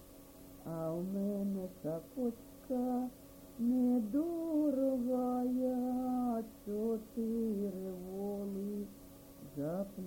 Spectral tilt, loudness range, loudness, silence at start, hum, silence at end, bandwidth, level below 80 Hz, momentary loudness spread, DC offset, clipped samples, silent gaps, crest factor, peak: -8.5 dB/octave; 5 LU; -37 LUFS; 0 s; none; 0 s; 17 kHz; -64 dBFS; 17 LU; under 0.1%; under 0.1%; none; 12 dB; -24 dBFS